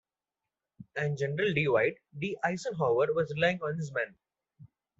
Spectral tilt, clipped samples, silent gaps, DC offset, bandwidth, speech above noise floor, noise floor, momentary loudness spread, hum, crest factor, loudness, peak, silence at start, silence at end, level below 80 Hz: -6 dB/octave; under 0.1%; none; under 0.1%; 8 kHz; over 60 dB; under -90 dBFS; 9 LU; none; 20 dB; -30 LUFS; -12 dBFS; 0.8 s; 0.35 s; -68 dBFS